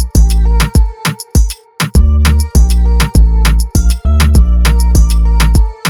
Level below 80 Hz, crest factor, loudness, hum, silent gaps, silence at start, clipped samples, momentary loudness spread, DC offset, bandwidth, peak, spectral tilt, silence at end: -8 dBFS; 8 dB; -11 LUFS; none; none; 0 s; under 0.1%; 5 LU; under 0.1%; 15.5 kHz; 0 dBFS; -5 dB/octave; 0 s